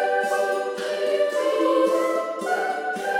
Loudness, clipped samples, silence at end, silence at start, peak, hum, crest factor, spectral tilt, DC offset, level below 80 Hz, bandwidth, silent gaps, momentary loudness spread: -23 LUFS; under 0.1%; 0 s; 0 s; -8 dBFS; none; 14 dB; -3 dB/octave; under 0.1%; -84 dBFS; 16.5 kHz; none; 6 LU